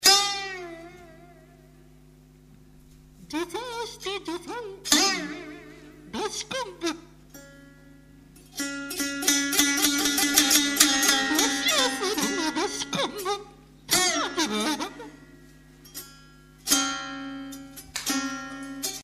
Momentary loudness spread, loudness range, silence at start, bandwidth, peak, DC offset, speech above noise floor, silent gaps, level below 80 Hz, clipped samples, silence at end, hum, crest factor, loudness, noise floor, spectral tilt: 20 LU; 15 LU; 0 s; 15.5 kHz; -2 dBFS; under 0.1%; 24 dB; none; -56 dBFS; under 0.1%; 0 s; none; 26 dB; -24 LUFS; -53 dBFS; -0.5 dB/octave